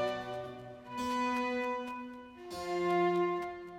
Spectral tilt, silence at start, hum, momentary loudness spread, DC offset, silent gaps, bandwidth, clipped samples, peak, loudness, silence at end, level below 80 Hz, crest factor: -5.5 dB/octave; 0 s; none; 15 LU; under 0.1%; none; 15.5 kHz; under 0.1%; -20 dBFS; -35 LUFS; 0 s; -68 dBFS; 14 dB